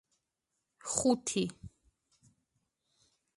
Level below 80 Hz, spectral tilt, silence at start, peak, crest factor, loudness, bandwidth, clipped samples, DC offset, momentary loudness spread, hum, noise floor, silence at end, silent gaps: -66 dBFS; -4 dB/octave; 0.85 s; -12 dBFS; 26 dB; -32 LUFS; 11.5 kHz; under 0.1%; under 0.1%; 17 LU; none; -86 dBFS; 1.7 s; none